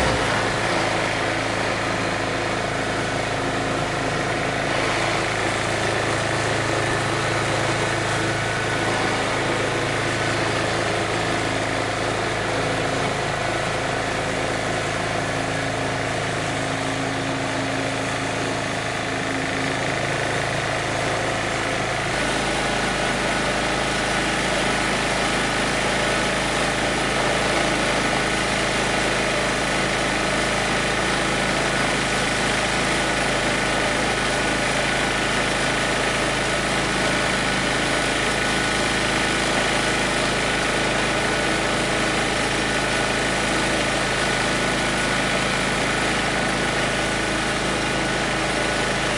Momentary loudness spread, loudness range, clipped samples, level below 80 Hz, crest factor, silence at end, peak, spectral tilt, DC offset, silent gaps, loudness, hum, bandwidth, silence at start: 3 LU; 3 LU; under 0.1%; -40 dBFS; 16 dB; 0 s; -6 dBFS; -3.5 dB/octave; under 0.1%; none; -21 LUFS; none; 11.5 kHz; 0 s